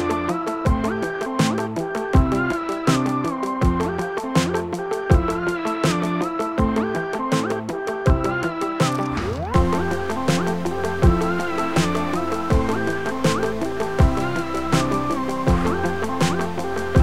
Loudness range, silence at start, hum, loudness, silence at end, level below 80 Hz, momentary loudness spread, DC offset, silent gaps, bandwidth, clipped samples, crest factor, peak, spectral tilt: 1 LU; 0 s; none; -22 LUFS; 0 s; -30 dBFS; 5 LU; under 0.1%; none; 16 kHz; under 0.1%; 20 dB; -2 dBFS; -6 dB/octave